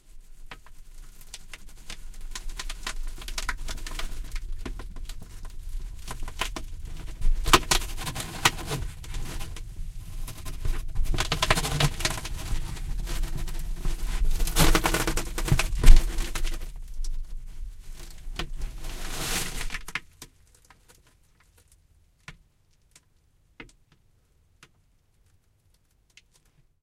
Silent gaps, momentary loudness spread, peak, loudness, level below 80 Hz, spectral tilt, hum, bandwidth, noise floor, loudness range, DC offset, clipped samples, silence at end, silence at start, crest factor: none; 22 LU; 0 dBFS; -29 LUFS; -28 dBFS; -3 dB/octave; none; 16 kHz; -64 dBFS; 12 LU; under 0.1%; under 0.1%; 3.2 s; 0.1 s; 26 dB